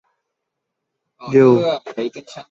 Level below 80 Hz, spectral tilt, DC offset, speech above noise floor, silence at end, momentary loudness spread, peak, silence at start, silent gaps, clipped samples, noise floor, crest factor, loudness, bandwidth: -62 dBFS; -7.5 dB/octave; under 0.1%; 62 dB; 0.1 s; 22 LU; -2 dBFS; 1.2 s; none; under 0.1%; -79 dBFS; 18 dB; -16 LUFS; 7.6 kHz